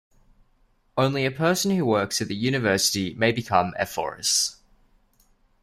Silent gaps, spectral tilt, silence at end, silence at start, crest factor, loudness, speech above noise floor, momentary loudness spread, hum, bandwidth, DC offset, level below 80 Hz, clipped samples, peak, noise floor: none; -3.5 dB/octave; 1.1 s; 0.95 s; 20 dB; -23 LUFS; 40 dB; 6 LU; none; 16 kHz; under 0.1%; -58 dBFS; under 0.1%; -6 dBFS; -63 dBFS